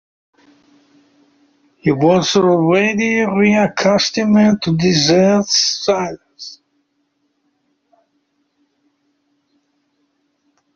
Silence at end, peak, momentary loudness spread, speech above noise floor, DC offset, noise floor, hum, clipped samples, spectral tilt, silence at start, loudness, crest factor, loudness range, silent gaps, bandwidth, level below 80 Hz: 4.2 s; -2 dBFS; 10 LU; 53 dB; under 0.1%; -66 dBFS; none; under 0.1%; -4 dB/octave; 1.85 s; -14 LUFS; 16 dB; 8 LU; none; 7.4 kHz; -54 dBFS